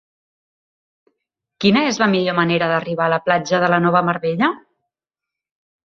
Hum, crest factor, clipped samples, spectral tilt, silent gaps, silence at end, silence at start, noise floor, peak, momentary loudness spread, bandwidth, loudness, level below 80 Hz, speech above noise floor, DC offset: none; 18 dB; under 0.1%; -5.5 dB/octave; none; 1.35 s; 1.6 s; -86 dBFS; -2 dBFS; 4 LU; 7.4 kHz; -17 LUFS; -60 dBFS; 69 dB; under 0.1%